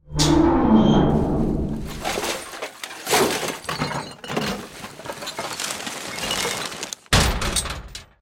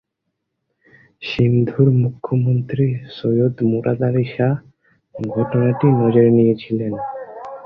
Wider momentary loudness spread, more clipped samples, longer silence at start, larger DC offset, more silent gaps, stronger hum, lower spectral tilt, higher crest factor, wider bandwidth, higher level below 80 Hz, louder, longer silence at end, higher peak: about the same, 15 LU vs 13 LU; neither; second, 0.05 s vs 1.2 s; neither; neither; neither; second, -4 dB/octave vs -10.5 dB/octave; about the same, 20 dB vs 16 dB; first, 17 kHz vs 5.6 kHz; first, -34 dBFS vs -52 dBFS; second, -22 LUFS vs -18 LUFS; first, 0.15 s vs 0 s; about the same, -4 dBFS vs -2 dBFS